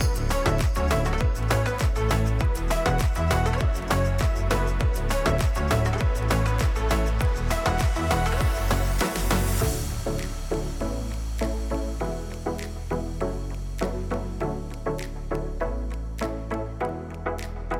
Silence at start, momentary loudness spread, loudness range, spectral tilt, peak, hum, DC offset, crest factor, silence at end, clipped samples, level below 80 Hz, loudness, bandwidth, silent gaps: 0 s; 8 LU; 7 LU; -5.5 dB/octave; -12 dBFS; none; under 0.1%; 12 dB; 0 s; under 0.1%; -28 dBFS; -26 LUFS; 18.5 kHz; none